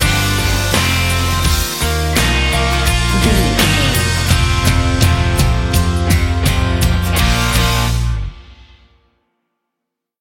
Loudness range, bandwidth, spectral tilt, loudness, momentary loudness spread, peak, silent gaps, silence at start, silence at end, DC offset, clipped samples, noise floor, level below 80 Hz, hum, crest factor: 4 LU; 17 kHz; -4 dB/octave; -14 LUFS; 3 LU; 0 dBFS; none; 0 s; 1.65 s; under 0.1%; under 0.1%; -79 dBFS; -20 dBFS; none; 14 dB